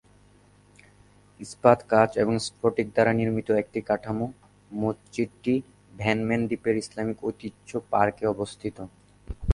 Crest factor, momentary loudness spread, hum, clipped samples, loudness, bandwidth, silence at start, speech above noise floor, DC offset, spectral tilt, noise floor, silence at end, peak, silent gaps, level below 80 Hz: 24 dB; 15 LU; 50 Hz at -60 dBFS; under 0.1%; -26 LUFS; 11.5 kHz; 1.4 s; 32 dB; under 0.1%; -6.5 dB/octave; -57 dBFS; 0 s; -2 dBFS; none; -42 dBFS